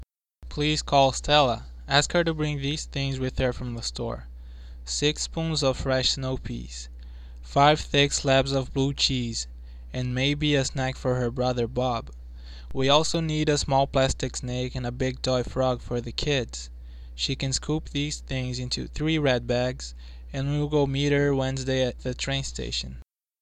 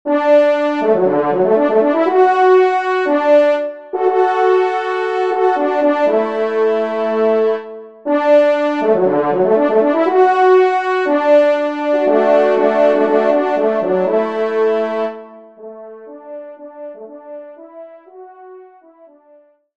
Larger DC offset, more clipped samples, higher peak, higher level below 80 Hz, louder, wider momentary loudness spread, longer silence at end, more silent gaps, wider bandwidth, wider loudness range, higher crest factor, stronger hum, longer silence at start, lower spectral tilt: second, under 0.1% vs 0.3%; neither; second, -4 dBFS vs 0 dBFS; first, -40 dBFS vs -68 dBFS; second, -26 LUFS vs -14 LUFS; second, 17 LU vs 21 LU; second, 0.4 s vs 1.15 s; neither; first, 10.5 kHz vs 7.8 kHz; second, 4 LU vs 12 LU; first, 22 dB vs 14 dB; neither; about the same, 0 s vs 0.05 s; second, -4.5 dB/octave vs -6.5 dB/octave